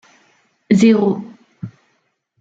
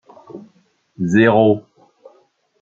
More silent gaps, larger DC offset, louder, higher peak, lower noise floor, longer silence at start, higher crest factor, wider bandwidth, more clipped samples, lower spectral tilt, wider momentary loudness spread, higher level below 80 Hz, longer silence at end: neither; neither; about the same, -15 LUFS vs -15 LUFS; about the same, -2 dBFS vs 0 dBFS; first, -66 dBFS vs -58 dBFS; first, 0.7 s vs 0.35 s; about the same, 18 dB vs 18 dB; about the same, 8 kHz vs 7.4 kHz; neither; about the same, -7 dB/octave vs -7.5 dB/octave; second, 23 LU vs 26 LU; about the same, -62 dBFS vs -60 dBFS; second, 0.7 s vs 1 s